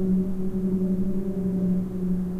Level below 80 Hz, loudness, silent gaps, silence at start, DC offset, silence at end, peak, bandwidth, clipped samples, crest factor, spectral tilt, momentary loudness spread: -40 dBFS; -26 LUFS; none; 0 s; under 0.1%; 0 s; -14 dBFS; 2.4 kHz; under 0.1%; 10 dB; -11 dB/octave; 3 LU